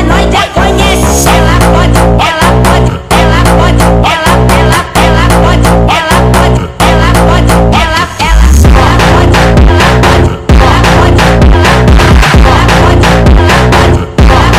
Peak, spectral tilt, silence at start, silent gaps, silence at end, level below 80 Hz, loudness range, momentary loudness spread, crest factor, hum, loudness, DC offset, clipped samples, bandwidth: 0 dBFS; -5.5 dB/octave; 0 s; none; 0 s; -8 dBFS; 2 LU; 3 LU; 4 dB; none; -5 LUFS; 1%; 6%; 16 kHz